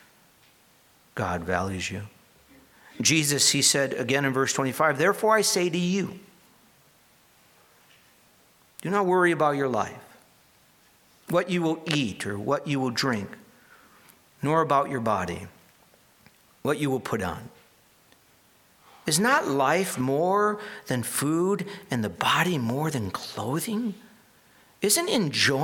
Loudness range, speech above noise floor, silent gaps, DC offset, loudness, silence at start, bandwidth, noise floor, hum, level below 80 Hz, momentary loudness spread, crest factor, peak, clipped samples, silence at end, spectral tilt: 8 LU; 35 dB; none; under 0.1%; -25 LUFS; 1.15 s; 19 kHz; -60 dBFS; none; -62 dBFS; 12 LU; 22 dB; -6 dBFS; under 0.1%; 0 s; -3.5 dB/octave